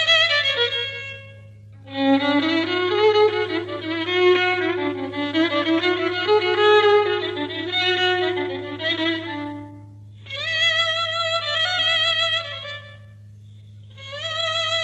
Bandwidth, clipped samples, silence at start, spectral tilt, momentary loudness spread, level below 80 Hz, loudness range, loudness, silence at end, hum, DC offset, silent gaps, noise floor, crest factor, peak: 8.6 kHz; under 0.1%; 0 s; -4 dB/octave; 14 LU; -62 dBFS; 4 LU; -20 LUFS; 0 s; none; under 0.1%; none; -43 dBFS; 16 dB; -6 dBFS